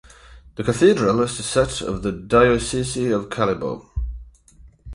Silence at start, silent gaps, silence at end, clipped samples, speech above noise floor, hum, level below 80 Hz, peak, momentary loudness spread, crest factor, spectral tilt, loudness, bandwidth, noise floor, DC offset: 0.3 s; none; 0 s; under 0.1%; 30 dB; none; -36 dBFS; -4 dBFS; 15 LU; 18 dB; -5 dB/octave; -20 LUFS; 11.5 kHz; -49 dBFS; under 0.1%